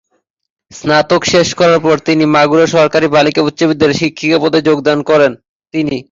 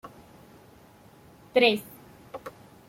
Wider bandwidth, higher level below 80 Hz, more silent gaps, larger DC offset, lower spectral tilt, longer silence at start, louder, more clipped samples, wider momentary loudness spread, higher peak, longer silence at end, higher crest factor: second, 7.8 kHz vs 16.5 kHz; first, -48 dBFS vs -66 dBFS; first, 5.49-5.60 s vs none; neither; about the same, -5 dB/octave vs -4 dB/octave; first, 0.75 s vs 0.05 s; first, -11 LUFS vs -24 LUFS; neither; second, 5 LU vs 25 LU; first, 0 dBFS vs -8 dBFS; second, 0.1 s vs 0.4 s; second, 12 dB vs 24 dB